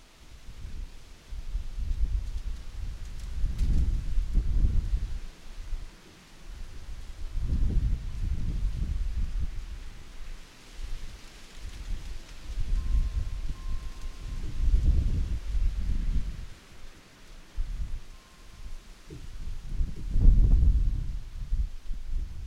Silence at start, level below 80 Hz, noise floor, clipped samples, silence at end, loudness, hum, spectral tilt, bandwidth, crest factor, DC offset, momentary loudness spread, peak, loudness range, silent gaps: 0 s; -28 dBFS; -50 dBFS; under 0.1%; 0 s; -33 LUFS; none; -6.5 dB/octave; 8.8 kHz; 22 dB; under 0.1%; 21 LU; -6 dBFS; 11 LU; none